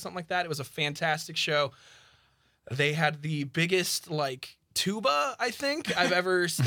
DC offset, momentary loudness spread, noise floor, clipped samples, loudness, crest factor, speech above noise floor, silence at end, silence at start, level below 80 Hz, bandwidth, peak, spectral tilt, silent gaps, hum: under 0.1%; 8 LU; -67 dBFS; under 0.1%; -28 LUFS; 20 dB; 38 dB; 0 s; 0 s; -70 dBFS; 19.5 kHz; -8 dBFS; -4 dB/octave; none; none